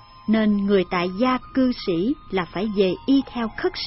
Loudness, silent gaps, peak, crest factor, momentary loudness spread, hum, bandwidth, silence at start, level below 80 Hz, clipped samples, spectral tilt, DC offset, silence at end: -22 LUFS; none; -8 dBFS; 14 dB; 6 LU; none; 6 kHz; 0.15 s; -46 dBFS; under 0.1%; -9.5 dB/octave; under 0.1%; 0 s